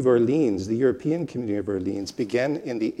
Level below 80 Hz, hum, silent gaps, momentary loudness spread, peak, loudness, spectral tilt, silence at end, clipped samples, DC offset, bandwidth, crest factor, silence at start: -64 dBFS; none; none; 8 LU; -8 dBFS; -25 LUFS; -7 dB/octave; 0 s; under 0.1%; under 0.1%; 11.5 kHz; 16 dB; 0 s